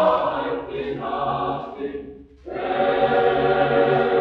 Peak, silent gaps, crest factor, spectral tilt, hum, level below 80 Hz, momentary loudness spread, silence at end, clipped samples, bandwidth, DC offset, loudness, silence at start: -6 dBFS; none; 16 dB; -8 dB/octave; none; -50 dBFS; 14 LU; 0 s; under 0.1%; 5.6 kHz; under 0.1%; -22 LUFS; 0 s